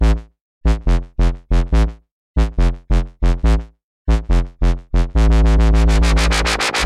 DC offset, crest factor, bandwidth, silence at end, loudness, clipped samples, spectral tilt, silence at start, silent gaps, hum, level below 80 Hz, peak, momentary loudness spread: under 0.1%; 10 dB; 11 kHz; 0 s; -18 LUFS; under 0.1%; -5.5 dB/octave; 0 s; 0.41-0.61 s, 2.11-2.34 s, 3.84-4.05 s; none; -16 dBFS; -4 dBFS; 7 LU